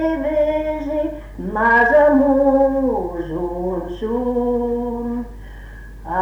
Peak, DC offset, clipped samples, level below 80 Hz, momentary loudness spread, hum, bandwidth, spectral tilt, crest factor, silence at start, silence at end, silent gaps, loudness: -4 dBFS; under 0.1%; under 0.1%; -36 dBFS; 18 LU; none; 7.4 kHz; -8 dB/octave; 14 dB; 0 s; 0 s; none; -18 LUFS